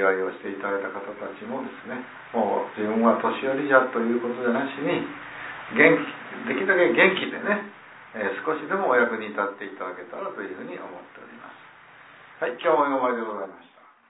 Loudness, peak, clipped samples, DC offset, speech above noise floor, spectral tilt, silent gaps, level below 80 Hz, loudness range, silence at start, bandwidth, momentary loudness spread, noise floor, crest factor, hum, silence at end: -24 LUFS; -2 dBFS; under 0.1%; under 0.1%; 24 dB; -9 dB/octave; none; -74 dBFS; 7 LU; 0 s; 4 kHz; 17 LU; -49 dBFS; 22 dB; none; 0.5 s